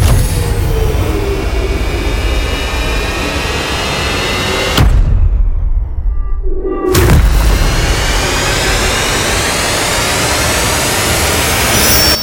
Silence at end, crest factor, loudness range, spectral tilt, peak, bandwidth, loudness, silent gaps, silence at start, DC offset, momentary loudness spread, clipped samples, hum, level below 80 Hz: 0 s; 12 dB; 4 LU; -3.5 dB/octave; 0 dBFS; 17 kHz; -12 LUFS; none; 0 s; under 0.1%; 7 LU; under 0.1%; none; -14 dBFS